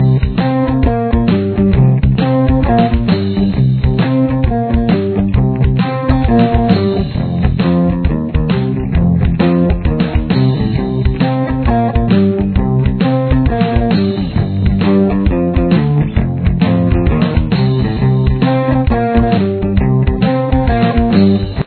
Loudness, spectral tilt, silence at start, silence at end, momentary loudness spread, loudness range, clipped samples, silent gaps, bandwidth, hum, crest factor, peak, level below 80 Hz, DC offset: -13 LUFS; -11.5 dB/octave; 0 s; 0 s; 4 LU; 1 LU; under 0.1%; none; 4.5 kHz; none; 12 dB; 0 dBFS; -20 dBFS; under 0.1%